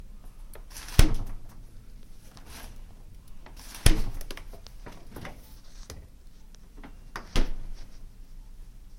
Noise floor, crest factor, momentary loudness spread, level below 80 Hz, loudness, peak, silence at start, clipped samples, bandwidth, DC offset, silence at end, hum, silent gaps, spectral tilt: -47 dBFS; 30 dB; 26 LU; -32 dBFS; -32 LUFS; 0 dBFS; 0 s; under 0.1%; 16.5 kHz; under 0.1%; 0 s; none; none; -4 dB/octave